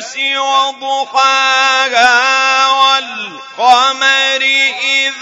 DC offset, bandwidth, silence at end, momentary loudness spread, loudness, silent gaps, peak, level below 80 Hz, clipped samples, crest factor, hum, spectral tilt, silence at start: under 0.1%; 12 kHz; 0 s; 6 LU; -10 LUFS; none; 0 dBFS; -64 dBFS; 0.2%; 12 dB; none; 1.5 dB/octave; 0 s